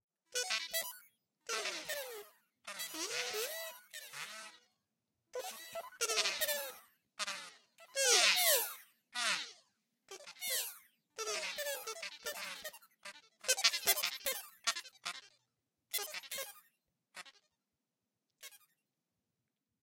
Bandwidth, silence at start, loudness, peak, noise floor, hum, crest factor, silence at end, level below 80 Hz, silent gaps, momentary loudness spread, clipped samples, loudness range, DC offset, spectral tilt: 16.5 kHz; 0.3 s; -36 LUFS; -8 dBFS; -89 dBFS; none; 32 dB; 1.25 s; -86 dBFS; none; 23 LU; under 0.1%; 13 LU; under 0.1%; 2 dB/octave